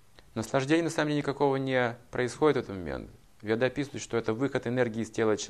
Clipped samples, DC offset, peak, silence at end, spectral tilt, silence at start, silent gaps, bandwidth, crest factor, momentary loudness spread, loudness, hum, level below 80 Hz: under 0.1%; under 0.1%; -12 dBFS; 0 s; -5.5 dB/octave; 0.35 s; none; 13.5 kHz; 18 dB; 11 LU; -29 LUFS; none; -58 dBFS